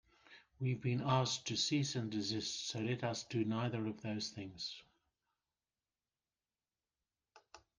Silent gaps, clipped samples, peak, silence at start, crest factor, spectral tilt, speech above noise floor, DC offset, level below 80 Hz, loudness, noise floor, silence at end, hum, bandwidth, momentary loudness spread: none; under 0.1%; -20 dBFS; 0.3 s; 20 dB; -4.5 dB/octave; over 51 dB; under 0.1%; -76 dBFS; -39 LUFS; under -90 dBFS; 0.2 s; none; 10 kHz; 10 LU